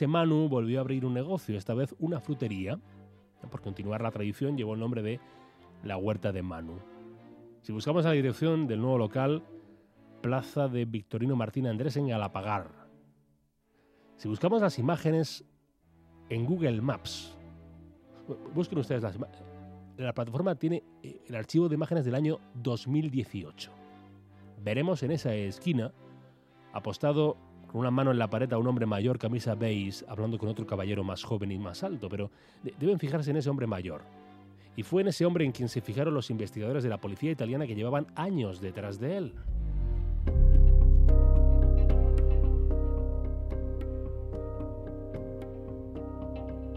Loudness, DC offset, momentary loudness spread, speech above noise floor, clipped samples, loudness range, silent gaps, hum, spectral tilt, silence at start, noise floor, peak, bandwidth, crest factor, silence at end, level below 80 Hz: -31 LUFS; under 0.1%; 15 LU; 39 dB; under 0.1%; 8 LU; none; none; -7.5 dB/octave; 0 s; -70 dBFS; -12 dBFS; 10 kHz; 18 dB; 0 s; -32 dBFS